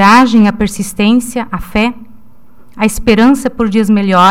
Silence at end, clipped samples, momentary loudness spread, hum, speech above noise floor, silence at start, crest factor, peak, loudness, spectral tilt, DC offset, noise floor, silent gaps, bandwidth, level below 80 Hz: 0 s; 0.2%; 9 LU; none; 35 dB; 0 s; 10 dB; 0 dBFS; -11 LUFS; -5 dB/octave; 3%; -45 dBFS; none; 16 kHz; -32 dBFS